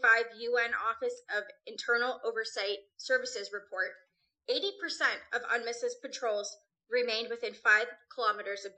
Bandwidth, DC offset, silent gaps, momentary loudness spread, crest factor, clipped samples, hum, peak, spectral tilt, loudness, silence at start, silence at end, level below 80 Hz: 9 kHz; under 0.1%; none; 10 LU; 22 dB; under 0.1%; none; -12 dBFS; 0 dB/octave; -32 LUFS; 0 s; 0.05 s; -82 dBFS